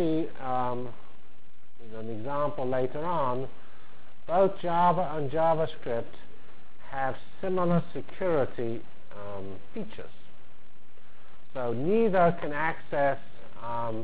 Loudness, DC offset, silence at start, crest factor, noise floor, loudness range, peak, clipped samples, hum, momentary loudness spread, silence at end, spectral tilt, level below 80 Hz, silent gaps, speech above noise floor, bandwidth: -29 LUFS; 4%; 0 s; 18 dB; -61 dBFS; 7 LU; -12 dBFS; under 0.1%; none; 17 LU; 0 s; -10.5 dB/octave; -58 dBFS; none; 32 dB; 4 kHz